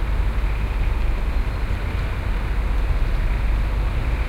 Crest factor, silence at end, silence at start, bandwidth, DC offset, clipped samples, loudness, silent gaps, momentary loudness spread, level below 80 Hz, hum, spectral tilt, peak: 12 dB; 0 s; 0 s; 7.4 kHz; under 0.1%; under 0.1%; -25 LUFS; none; 2 LU; -20 dBFS; none; -7 dB/octave; -8 dBFS